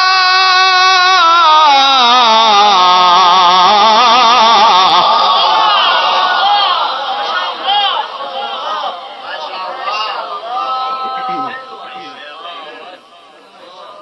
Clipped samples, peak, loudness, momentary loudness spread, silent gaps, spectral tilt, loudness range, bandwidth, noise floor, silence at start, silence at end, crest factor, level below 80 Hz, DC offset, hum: under 0.1%; 0 dBFS; -9 LUFS; 19 LU; none; -1 dB/octave; 14 LU; 6.4 kHz; -40 dBFS; 0 s; 0 s; 10 dB; -64 dBFS; under 0.1%; none